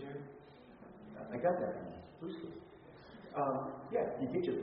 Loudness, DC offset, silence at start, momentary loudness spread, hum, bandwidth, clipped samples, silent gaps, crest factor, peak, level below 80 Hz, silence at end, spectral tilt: -40 LUFS; under 0.1%; 0 s; 21 LU; none; 5.4 kHz; under 0.1%; none; 18 dB; -22 dBFS; -72 dBFS; 0 s; -6.5 dB/octave